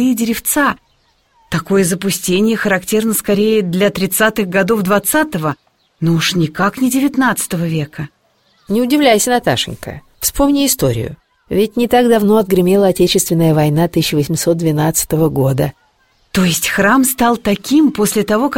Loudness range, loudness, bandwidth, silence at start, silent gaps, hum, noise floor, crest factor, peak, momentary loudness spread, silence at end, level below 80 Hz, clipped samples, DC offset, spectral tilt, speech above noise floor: 3 LU; -14 LUFS; 17 kHz; 0 s; none; none; -57 dBFS; 14 dB; 0 dBFS; 9 LU; 0 s; -40 dBFS; under 0.1%; 0.3%; -4.5 dB/octave; 43 dB